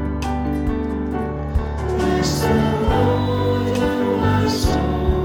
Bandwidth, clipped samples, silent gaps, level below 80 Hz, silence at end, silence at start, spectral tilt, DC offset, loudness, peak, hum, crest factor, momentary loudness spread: 19 kHz; under 0.1%; none; -26 dBFS; 0 s; 0 s; -6.5 dB/octave; under 0.1%; -20 LUFS; -4 dBFS; none; 16 dB; 6 LU